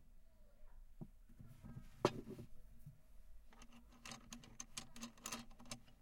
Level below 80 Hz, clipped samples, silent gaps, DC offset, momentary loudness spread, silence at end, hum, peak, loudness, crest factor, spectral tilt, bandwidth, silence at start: -62 dBFS; under 0.1%; none; under 0.1%; 26 LU; 0 s; none; -18 dBFS; -50 LUFS; 32 dB; -4 dB/octave; 16.5 kHz; 0 s